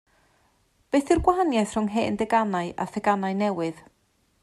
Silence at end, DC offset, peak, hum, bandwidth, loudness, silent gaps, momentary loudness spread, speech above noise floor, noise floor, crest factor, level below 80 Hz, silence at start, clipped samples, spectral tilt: 0.65 s; under 0.1%; -6 dBFS; none; 12.5 kHz; -25 LUFS; none; 7 LU; 43 dB; -67 dBFS; 20 dB; -46 dBFS; 0.95 s; under 0.1%; -6 dB/octave